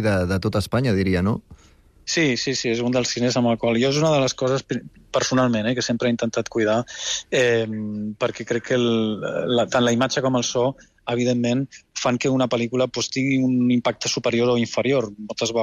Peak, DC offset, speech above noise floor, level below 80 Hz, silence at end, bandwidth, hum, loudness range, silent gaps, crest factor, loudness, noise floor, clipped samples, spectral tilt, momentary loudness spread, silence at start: -8 dBFS; under 0.1%; 32 dB; -52 dBFS; 0 s; 13.5 kHz; none; 1 LU; none; 12 dB; -22 LUFS; -53 dBFS; under 0.1%; -4.5 dB/octave; 7 LU; 0 s